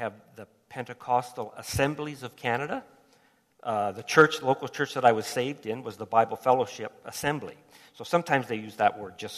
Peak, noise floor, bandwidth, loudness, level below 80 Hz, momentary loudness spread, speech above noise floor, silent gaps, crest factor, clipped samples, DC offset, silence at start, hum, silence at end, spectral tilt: -6 dBFS; -64 dBFS; 14 kHz; -27 LUFS; -60 dBFS; 15 LU; 36 dB; none; 24 dB; under 0.1%; under 0.1%; 0 s; none; 0 s; -4.5 dB/octave